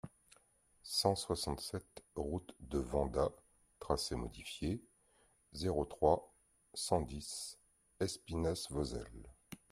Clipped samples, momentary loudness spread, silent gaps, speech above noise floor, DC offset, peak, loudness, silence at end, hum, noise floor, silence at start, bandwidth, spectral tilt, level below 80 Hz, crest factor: under 0.1%; 19 LU; none; 34 dB; under 0.1%; -16 dBFS; -39 LUFS; 0.15 s; none; -72 dBFS; 0.05 s; 15.5 kHz; -5 dB/octave; -54 dBFS; 24 dB